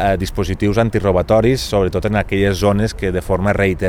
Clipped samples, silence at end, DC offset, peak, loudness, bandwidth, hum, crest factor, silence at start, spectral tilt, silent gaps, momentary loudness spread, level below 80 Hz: under 0.1%; 0 s; under 0.1%; 0 dBFS; -16 LUFS; 16 kHz; none; 16 dB; 0 s; -6.5 dB/octave; none; 5 LU; -30 dBFS